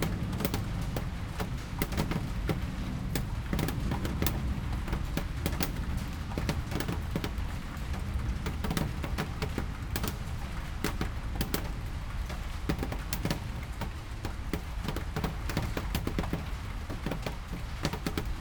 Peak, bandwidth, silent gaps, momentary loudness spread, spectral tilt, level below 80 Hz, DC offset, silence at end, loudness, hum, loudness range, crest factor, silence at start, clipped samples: -8 dBFS; over 20 kHz; none; 6 LU; -5.5 dB/octave; -38 dBFS; under 0.1%; 0 s; -35 LUFS; none; 3 LU; 26 dB; 0 s; under 0.1%